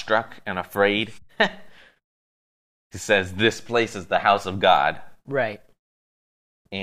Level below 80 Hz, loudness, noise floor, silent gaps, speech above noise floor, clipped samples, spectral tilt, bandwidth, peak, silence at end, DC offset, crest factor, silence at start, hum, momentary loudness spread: -62 dBFS; -22 LUFS; under -90 dBFS; 2.04-2.90 s, 5.79-6.65 s; over 68 dB; under 0.1%; -4 dB/octave; 15 kHz; -4 dBFS; 0 s; under 0.1%; 20 dB; 0 s; none; 15 LU